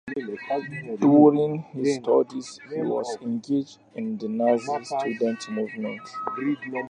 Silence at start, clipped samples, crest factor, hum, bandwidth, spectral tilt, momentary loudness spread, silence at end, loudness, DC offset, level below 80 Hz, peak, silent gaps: 0.05 s; under 0.1%; 20 dB; none; 10 kHz; -6.5 dB/octave; 14 LU; 0 s; -25 LUFS; under 0.1%; -74 dBFS; -4 dBFS; none